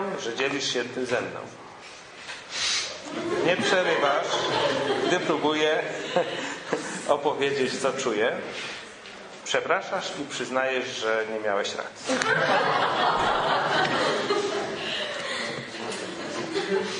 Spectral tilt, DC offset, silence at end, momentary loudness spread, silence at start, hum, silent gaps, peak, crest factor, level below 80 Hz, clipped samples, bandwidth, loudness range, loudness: -3 dB/octave; under 0.1%; 0 s; 11 LU; 0 s; none; none; -4 dBFS; 22 dB; -64 dBFS; under 0.1%; 10.5 kHz; 4 LU; -26 LUFS